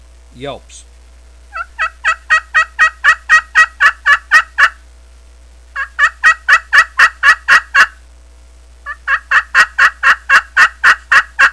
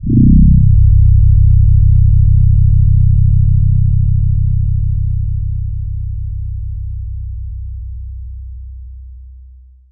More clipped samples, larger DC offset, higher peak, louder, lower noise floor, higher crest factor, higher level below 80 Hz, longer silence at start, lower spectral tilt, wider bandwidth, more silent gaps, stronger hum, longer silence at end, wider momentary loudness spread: first, 0.7% vs under 0.1%; second, 0.3% vs 3%; about the same, 0 dBFS vs -2 dBFS; first, -9 LUFS vs -12 LUFS; about the same, -40 dBFS vs -39 dBFS; about the same, 12 dB vs 8 dB; second, -40 dBFS vs -14 dBFS; first, 0.4 s vs 0 s; second, 0 dB/octave vs -17.5 dB/octave; first, 11 kHz vs 0.4 kHz; neither; neither; about the same, 0 s vs 0 s; about the same, 17 LU vs 19 LU